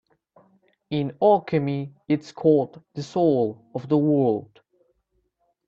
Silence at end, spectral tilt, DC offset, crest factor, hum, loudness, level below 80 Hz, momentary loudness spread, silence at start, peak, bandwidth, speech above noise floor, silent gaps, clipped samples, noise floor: 1.25 s; -8.5 dB/octave; under 0.1%; 18 dB; none; -23 LUFS; -66 dBFS; 11 LU; 0.9 s; -6 dBFS; 7.6 kHz; 49 dB; none; under 0.1%; -72 dBFS